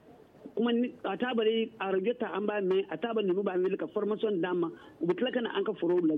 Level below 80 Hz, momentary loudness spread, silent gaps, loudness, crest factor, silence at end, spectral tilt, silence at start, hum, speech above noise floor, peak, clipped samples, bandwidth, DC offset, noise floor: -76 dBFS; 4 LU; none; -31 LUFS; 14 dB; 0 s; -8.5 dB/octave; 0.1 s; none; 22 dB; -16 dBFS; under 0.1%; 4.2 kHz; under 0.1%; -52 dBFS